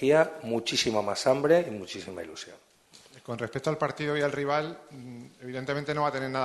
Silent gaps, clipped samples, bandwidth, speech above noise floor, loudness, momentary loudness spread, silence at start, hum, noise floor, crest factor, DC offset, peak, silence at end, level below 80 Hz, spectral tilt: none; under 0.1%; 12.5 kHz; 27 dB; -28 LUFS; 20 LU; 0 s; none; -55 dBFS; 22 dB; under 0.1%; -8 dBFS; 0 s; -66 dBFS; -4.5 dB/octave